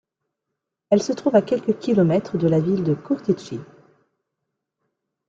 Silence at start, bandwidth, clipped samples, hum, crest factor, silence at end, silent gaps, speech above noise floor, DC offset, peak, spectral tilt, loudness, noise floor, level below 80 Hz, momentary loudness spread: 0.9 s; 7.8 kHz; under 0.1%; none; 20 dB; 1.65 s; none; 62 dB; under 0.1%; -4 dBFS; -7.5 dB/octave; -21 LUFS; -82 dBFS; -62 dBFS; 6 LU